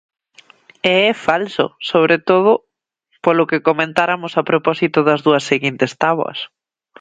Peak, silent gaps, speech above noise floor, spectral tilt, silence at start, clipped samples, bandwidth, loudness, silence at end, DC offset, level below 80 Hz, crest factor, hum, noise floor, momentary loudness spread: 0 dBFS; none; 48 dB; -5.5 dB/octave; 0.85 s; under 0.1%; 9.4 kHz; -16 LUFS; 0.55 s; under 0.1%; -62 dBFS; 16 dB; none; -64 dBFS; 7 LU